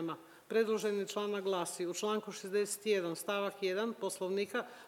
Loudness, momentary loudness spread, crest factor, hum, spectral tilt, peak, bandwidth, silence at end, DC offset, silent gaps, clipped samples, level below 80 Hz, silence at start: -36 LUFS; 5 LU; 16 dB; none; -3.5 dB/octave; -20 dBFS; 17 kHz; 0 s; under 0.1%; none; under 0.1%; -90 dBFS; 0 s